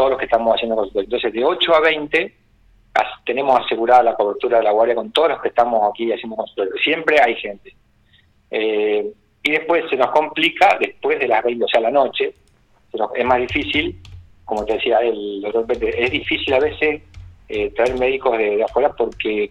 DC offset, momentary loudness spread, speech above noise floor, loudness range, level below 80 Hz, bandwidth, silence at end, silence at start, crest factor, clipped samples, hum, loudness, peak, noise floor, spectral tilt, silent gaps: under 0.1%; 9 LU; 38 dB; 3 LU; -48 dBFS; 11 kHz; 0.05 s; 0 s; 16 dB; under 0.1%; none; -18 LUFS; -2 dBFS; -55 dBFS; -5 dB/octave; none